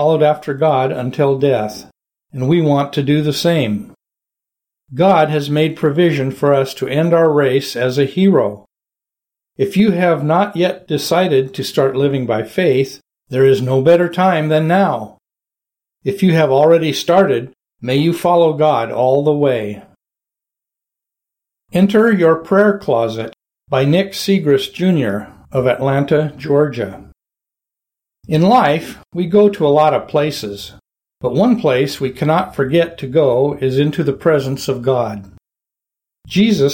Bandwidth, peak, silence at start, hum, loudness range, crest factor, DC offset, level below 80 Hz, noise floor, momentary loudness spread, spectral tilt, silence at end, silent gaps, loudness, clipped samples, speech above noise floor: 17 kHz; -2 dBFS; 0 s; none; 3 LU; 14 dB; under 0.1%; -52 dBFS; -88 dBFS; 10 LU; -6.5 dB/octave; 0 s; none; -15 LUFS; under 0.1%; 74 dB